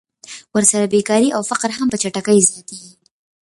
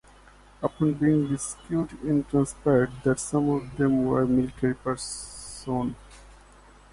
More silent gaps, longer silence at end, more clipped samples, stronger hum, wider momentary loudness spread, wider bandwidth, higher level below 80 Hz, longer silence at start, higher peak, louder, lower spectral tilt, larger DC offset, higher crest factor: neither; second, 0.55 s vs 0.7 s; neither; second, none vs 50 Hz at -50 dBFS; first, 21 LU vs 10 LU; about the same, 11.5 kHz vs 11.5 kHz; second, -58 dBFS vs -50 dBFS; second, 0.3 s vs 0.6 s; first, 0 dBFS vs -10 dBFS; first, -16 LUFS vs -26 LUFS; second, -3.5 dB/octave vs -6.5 dB/octave; neither; about the same, 18 dB vs 16 dB